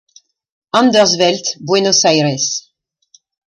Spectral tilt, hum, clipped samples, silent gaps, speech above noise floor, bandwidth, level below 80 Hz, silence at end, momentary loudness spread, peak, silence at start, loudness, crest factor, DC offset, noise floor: -3 dB/octave; none; under 0.1%; none; 40 dB; 11 kHz; -62 dBFS; 0.9 s; 8 LU; 0 dBFS; 0.75 s; -13 LUFS; 16 dB; under 0.1%; -53 dBFS